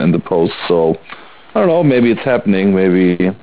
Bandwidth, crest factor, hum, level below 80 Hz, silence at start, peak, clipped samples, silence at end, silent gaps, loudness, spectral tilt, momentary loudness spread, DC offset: 4 kHz; 12 dB; none; -48 dBFS; 0 s; -2 dBFS; under 0.1%; 0.05 s; none; -13 LUFS; -11.5 dB/octave; 5 LU; 0.8%